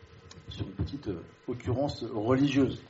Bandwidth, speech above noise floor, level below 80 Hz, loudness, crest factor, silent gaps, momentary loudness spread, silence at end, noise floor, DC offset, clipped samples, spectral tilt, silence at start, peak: 8 kHz; 20 dB; -50 dBFS; -31 LUFS; 18 dB; none; 17 LU; 0 s; -50 dBFS; under 0.1%; under 0.1%; -6.5 dB/octave; 0 s; -14 dBFS